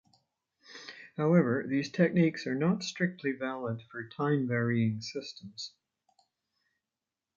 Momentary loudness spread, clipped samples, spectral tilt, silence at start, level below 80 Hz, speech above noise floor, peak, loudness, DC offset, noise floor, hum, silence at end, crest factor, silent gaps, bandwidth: 17 LU; under 0.1%; -6.5 dB/octave; 0.7 s; -74 dBFS; over 60 dB; -12 dBFS; -30 LUFS; under 0.1%; under -90 dBFS; none; 1.7 s; 20 dB; none; 7.4 kHz